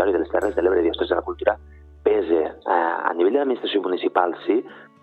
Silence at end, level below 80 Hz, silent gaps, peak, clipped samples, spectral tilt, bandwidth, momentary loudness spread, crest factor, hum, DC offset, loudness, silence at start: 0.2 s; -50 dBFS; none; -4 dBFS; under 0.1%; -6.5 dB/octave; 8.2 kHz; 4 LU; 18 dB; none; under 0.1%; -22 LUFS; 0 s